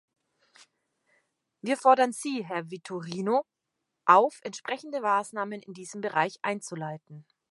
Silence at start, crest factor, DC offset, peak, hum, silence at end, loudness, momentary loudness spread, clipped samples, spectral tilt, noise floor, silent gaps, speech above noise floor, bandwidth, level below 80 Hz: 1.65 s; 24 dB; under 0.1%; -4 dBFS; none; 0.3 s; -27 LUFS; 17 LU; under 0.1%; -4.5 dB/octave; -83 dBFS; none; 56 dB; 11.5 kHz; -84 dBFS